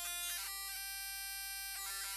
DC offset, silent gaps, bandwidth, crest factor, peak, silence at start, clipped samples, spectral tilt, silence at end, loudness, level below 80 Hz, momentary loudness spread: under 0.1%; none; 13.5 kHz; 16 dB; -28 dBFS; 0 s; under 0.1%; 2.5 dB/octave; 0 s; -41 LUFS; -66 dBFS; 3 LU